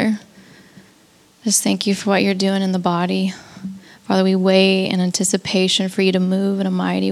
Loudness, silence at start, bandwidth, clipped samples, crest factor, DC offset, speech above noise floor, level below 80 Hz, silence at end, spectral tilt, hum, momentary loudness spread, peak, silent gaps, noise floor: -18 LUFS; 0 s; 14.5 kHz; under 0.1%; 16 dB; under 0.1%; 35 dB; -66 dBFS; 0 s; -4.5 dB/octave; none; 13 LU; -2 dBFS; none; -52 dBFS